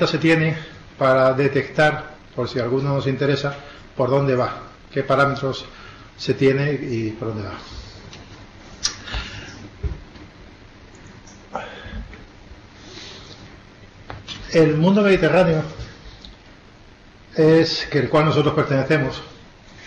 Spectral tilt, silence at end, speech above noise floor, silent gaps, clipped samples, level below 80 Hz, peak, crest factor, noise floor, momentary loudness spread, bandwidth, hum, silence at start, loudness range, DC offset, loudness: -6 dB/octave; 0 s; 28 dB; none; under 0.1%; -42 dBFS; -6 dBFS; 16 dB; -46 dBFS; 23 LU; 9.8 kHz; none; 0 s; 17 LU; under 0.1%; -20 LUFS